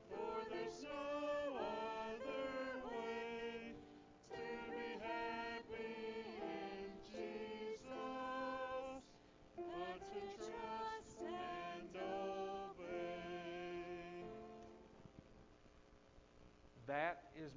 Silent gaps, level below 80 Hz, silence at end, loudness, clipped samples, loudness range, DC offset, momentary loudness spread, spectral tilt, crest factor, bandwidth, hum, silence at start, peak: none; -72 dBFS; 0 s; -48 LUFS; under 0.1%; 6 LU; under 0.1%; 18 LU; -5 dB/octave; 20 dB; 7.6 kHz; none; 0 s; -28 dBFS